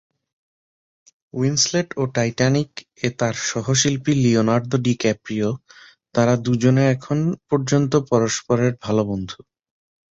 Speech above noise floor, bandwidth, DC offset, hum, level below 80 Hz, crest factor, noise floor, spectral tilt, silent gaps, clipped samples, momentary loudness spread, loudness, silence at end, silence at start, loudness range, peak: over 70 dB; 8 kHz; under 0.1%; none; -54 dBFS; 18 dB; under -90 dBFS; -5 dB/octave; none; under 0.1%; 8 LU; -20 LUFS; 0.75 s; 1.35 s; 2 LU; -4 dBFS